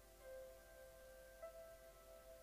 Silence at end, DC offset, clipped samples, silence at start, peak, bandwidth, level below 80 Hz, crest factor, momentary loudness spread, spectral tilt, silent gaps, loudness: 0 s; under 0.1%; under 0.1%; 0 s; -46 dBFS; 15.5 kHz; -70 dBFS; 14 dB; 5 LU; -3 dB/octave; none; -60 LUFS